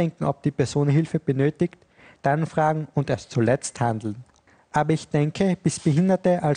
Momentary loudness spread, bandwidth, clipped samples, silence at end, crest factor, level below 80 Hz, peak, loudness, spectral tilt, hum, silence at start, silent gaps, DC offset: 7 LU; 10 kHz; under 0.1%; 0 s; 16 dB; -56 dBFS; -6 dBFS; -23 LUFS; -7 dB/octave; none; 0 s; none; under 0.1%